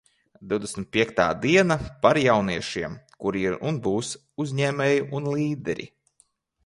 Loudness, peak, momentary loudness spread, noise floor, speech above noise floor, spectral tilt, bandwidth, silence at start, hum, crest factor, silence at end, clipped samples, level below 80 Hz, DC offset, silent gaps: -24 LUFS; -4 dBFS; 12 LU; -65 dBFS; 41 dB; -5.5 dB/octave; 11.5 kHz; 0.4 s; none; 22 dB; 0.8 s; under 0.1%; -54 dBFS; under 0.1%; none